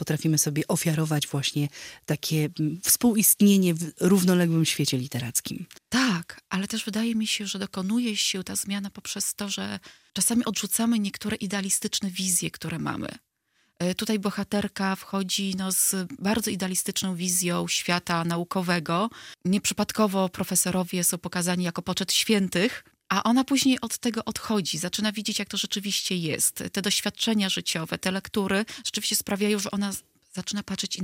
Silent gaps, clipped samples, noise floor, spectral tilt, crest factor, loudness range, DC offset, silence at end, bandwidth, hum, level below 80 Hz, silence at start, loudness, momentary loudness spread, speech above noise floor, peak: none; under 0.1%; -70 dBFS; -3.5 dB/octave; 20 dB; 5 LU; under 0.1%; 0 s; 16.5 kHz; none; -62 dBFS; 0 s; -25 LUFS; 9 LU; 44 dB; -6 dBFS